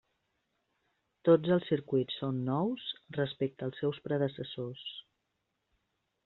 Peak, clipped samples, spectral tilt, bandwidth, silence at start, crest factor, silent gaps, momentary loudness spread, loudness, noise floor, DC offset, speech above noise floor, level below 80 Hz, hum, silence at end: -14 dBFS; under 0.1%; -6 dB/octave; 4.3 kHz; 1.25 s; 20 dB; none; 13 LU; -33 LUFS; -82 dBFS; under 0.1%; 50 dB; -74 dBFS; none; 1.25 s